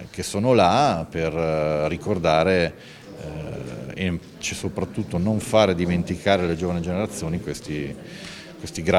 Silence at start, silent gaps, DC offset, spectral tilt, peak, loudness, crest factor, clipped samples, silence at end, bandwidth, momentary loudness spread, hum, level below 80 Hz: 0 s; none; under 0.1%; -5.5 dB/octave; -2 dBFS; -23 LUFS; 22 dB; under 0.1%; 0 s; 15 kHz; 16 LU; none; -46 dBFS